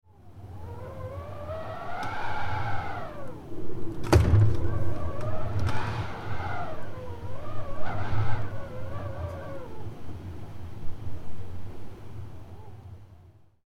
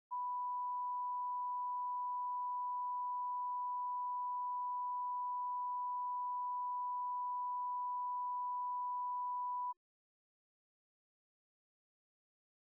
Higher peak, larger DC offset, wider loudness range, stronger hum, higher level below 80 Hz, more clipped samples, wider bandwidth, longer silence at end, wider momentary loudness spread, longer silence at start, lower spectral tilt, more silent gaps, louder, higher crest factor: first, -6 dBFS vs -36 dBFS; neither; first, 14 LU vs 4 LU; neither; first, -40 dBFS vs under -90 dBFS; neither; first, 13 kHz vs 1.2 kHz; second, 0.45 s vs 2.9 s; first, 16 LU vs 0 LU; first, 0.25 s vs 0.1 s; first, -7 dB/octave vs 6.5 dB/octave; neither; first, -32 LUFS vs -40 LUFS; first, 20 dB vs 4 dB